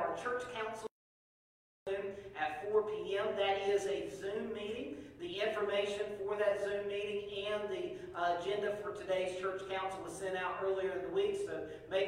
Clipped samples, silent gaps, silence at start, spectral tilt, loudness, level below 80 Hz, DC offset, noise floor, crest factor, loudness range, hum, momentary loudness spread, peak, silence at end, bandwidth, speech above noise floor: under 0.1%; 0.91-1.86 s; 0 s; -4 dB/octave; -38 LUFS; -68 dBFS; under 0.1%; under -90 dBFS; 18 dB; 1 LU; none; 8 LU; -20 dBFS; 0 s; 12.5 kHz; over 53 dB